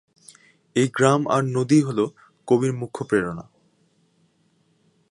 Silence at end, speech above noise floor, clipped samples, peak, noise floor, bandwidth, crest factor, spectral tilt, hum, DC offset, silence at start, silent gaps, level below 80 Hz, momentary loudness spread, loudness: 1.7 s; 44 dB; under 0.1%; -2 dBFS; -64 dBFS; 11.5 kHz; 22 dB; -6 dB/octave; none; under 0.1%; 0.75 s; none; -62 dBFS; 12 LU; -22 LUFS